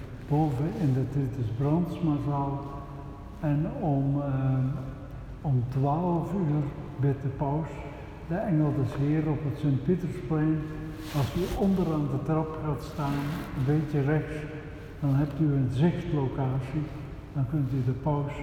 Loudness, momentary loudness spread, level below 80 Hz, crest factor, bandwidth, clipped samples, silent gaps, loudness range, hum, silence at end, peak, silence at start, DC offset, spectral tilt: -29 LUFS; 11 LU; -46 dBFS; 16 dB; 15 kHz; under 0.1%; none; 1 LU; none; 0 s; -12 dBFS; 0 s; under 0.1%; -9 dB/octave